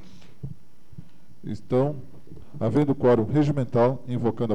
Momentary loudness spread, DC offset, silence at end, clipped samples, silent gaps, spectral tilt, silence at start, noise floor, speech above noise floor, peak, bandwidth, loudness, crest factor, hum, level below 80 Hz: 21 LU; 2%; 0 s; under 0.1%; none; -9.5 dB/octave; 0.45 s; -48 dBFS; 25 dB; -8 dBFS; 9.4 kHz; -23 LUFS; 18 dB; none; -54 dBFS